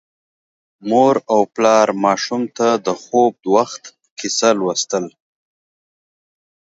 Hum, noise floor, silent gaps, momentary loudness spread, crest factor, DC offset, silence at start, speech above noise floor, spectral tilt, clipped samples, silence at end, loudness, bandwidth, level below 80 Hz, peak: none; under -90 dBFS; 4.11-4.17 s; 12 LU; 18 dB; under 0.1%; 0.85 s; over 74 dB; -3.5 dB/octave; under 0.1%; 1.55 s; -16 LUFS; 8 kHz; -68 dBFS; 0 dBFS